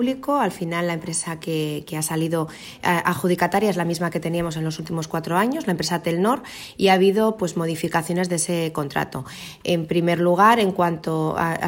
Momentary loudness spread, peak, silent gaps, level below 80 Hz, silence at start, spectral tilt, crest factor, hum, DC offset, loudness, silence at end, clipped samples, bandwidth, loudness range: 10 LU; -4 dBFS; none; -56 dBFS; 0 s; -5 dB/octave; 18 dB; none; under 0.1%; -22 LUFS; 0 s; under 0.1%; 16.5 kHz; 2 LU